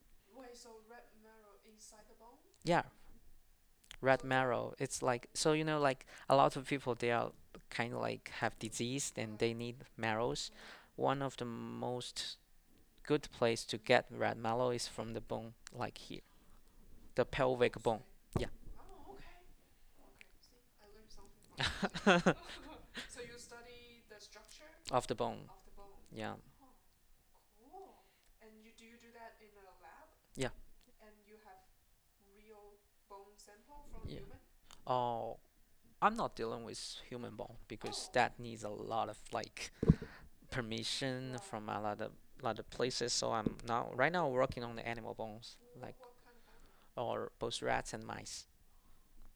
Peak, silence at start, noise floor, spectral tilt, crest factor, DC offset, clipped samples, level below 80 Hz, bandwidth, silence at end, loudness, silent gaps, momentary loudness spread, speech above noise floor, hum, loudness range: -12 dBFS; 0.35 s; -71 dBFS; -4.5 dB/octave; 28 dB; under 0.1%; under 0.1%; -58 dBFS; over 20 kHz; 0.05 s; -38 LUFS; none; 23 LU; 33 dB; none; 15 LU